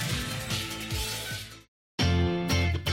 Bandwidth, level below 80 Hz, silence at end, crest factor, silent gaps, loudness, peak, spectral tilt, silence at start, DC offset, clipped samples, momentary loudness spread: 16.5 kHz; -40 dBFS; 0 s; 16 dB; 1.68-1.98 s; -29 LUFS; -14 dBFS; -4.5 dB/octave; 0 s; under 0.1%; under 0.1%; 11 LU